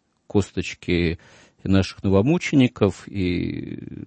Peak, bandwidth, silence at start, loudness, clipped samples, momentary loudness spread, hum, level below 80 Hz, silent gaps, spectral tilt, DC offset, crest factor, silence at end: -4 dBFS; 8.8 kHz; 0.35 s; -22 LUFS; under 0.1%; 12 LU; none; -46 dBFS; none; -6.5 dB/octave; under 0.1%; 20 dB; 0.05 s